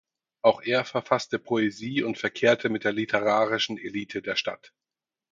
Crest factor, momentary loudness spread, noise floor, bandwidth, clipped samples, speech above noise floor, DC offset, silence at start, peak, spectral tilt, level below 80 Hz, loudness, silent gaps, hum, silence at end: 22 dB; 8 LU; under -90 dBFS; 7.6 kHz; under 0.1%; over 64 dB; under 0.1%; 0.45 s; -6 dBFS; -4.5 dB/octave; -70 dBFS; -26 LUFS; none; none; 0.75 s